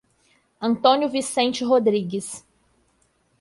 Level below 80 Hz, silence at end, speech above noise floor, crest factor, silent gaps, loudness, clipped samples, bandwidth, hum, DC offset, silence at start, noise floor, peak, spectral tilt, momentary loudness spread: -66 dBFS; 1 s; 44 dB; 20 dB; none; -21 LUFS; under 0.1%; 11.5 kHz; none; under 0.1%; 0.6 s; -65 dBFS; -4 dBFS; -4 dB/octave; 12 LU